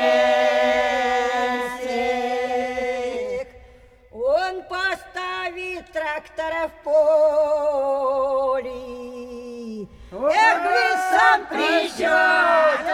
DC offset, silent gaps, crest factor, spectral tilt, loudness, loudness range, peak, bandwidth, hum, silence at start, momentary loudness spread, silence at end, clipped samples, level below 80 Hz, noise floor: under 0.1%; none; 18 dB; -2.5 dB/octave; -20 LUFS; 7 LU; -2 dBFS; 15 kHz; none; 0 s; 17 LU; 0 s; under 0.1%; -52 dBFS; -49 dBFS